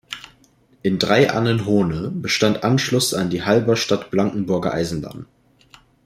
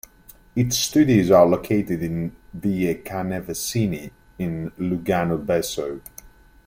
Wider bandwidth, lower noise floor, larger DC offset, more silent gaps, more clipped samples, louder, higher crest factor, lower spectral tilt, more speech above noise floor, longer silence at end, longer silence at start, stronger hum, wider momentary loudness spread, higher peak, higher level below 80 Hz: about the same, 16 kHz vs 16.5 kHz; first, -56 dBFS vs -50 dBFS; neither; neither; neither; first, -19 LUFS vs -22 LUFS; about the same, 18 dB vs 20 dB; about the same, -5 dB/octave vs -5.5 dB/octave; first, 37 dB vs 29 dB; first, 0.8 s vs 0.4 s; second, 0.1 s vs 0.55 s; neither; second, 10 LU vs 15 LU; about the same, -2 dBFS vs -2 dBFS; about the same, -50 dBFS vs -48 dBFS